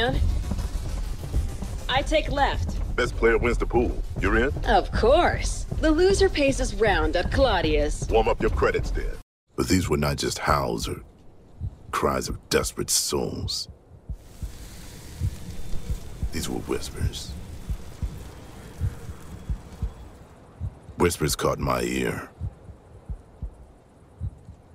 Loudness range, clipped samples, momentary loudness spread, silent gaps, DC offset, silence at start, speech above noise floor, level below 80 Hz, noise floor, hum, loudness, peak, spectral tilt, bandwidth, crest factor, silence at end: 12 LU; under 0.1%; 18 LU; 9.22-9.47 s; under 0.1%; 0 s; 28 dB; -32 dBFS; -51 dBFS; none; -25 LUFS; -4 dBFS; -4.5 dB/octave; 16 kHz; 20 dB; 0.2 s